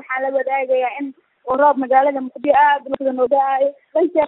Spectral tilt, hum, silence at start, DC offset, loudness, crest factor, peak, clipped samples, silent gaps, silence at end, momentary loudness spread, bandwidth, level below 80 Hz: -9 dB/octave; none; 0.1 s; under 0.1%; -17 LUFS; 14 dB; -2 dBFS; under 0.1%; none; 0 s; 9 LU; 4.1 kHz; -62 dBFS